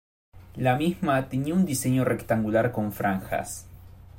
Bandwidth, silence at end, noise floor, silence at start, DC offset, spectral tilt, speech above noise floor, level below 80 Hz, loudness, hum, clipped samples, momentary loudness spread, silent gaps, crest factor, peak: 16.5 kHz; 0 s; -46 dBFS; 0.35 s; under 0.1%; -6 dB/octave; 21 dB; -52 dBFS; -26 LUFS; none; under 0.1%; 7 LU; none; 16 dB; -10 dBFS